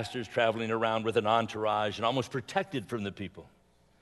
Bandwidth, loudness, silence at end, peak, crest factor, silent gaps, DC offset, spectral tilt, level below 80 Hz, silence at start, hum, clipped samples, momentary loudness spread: 12 kHz; -30 LUFS; 0.55 s; -12 dBFS; 20 dB; none; under 0.1%; -5.5 dB/octave; -68 dBFS; 0 s; none; under 0.1%; 9 LU